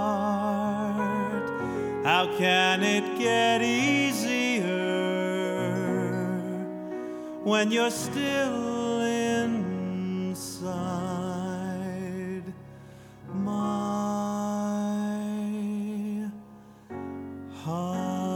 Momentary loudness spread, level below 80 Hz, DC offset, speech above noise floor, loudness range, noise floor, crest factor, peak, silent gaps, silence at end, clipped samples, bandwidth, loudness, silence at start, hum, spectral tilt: 13 LU; -64 dBFS; under 0.1%; 25 dB; 9 LU; -49 dBFS; 20 dB; -8 dBFS; none; 0 s; under 0.1%; 18 kHz; -28 LUFS; 0 s; none; -4.5 dB/octave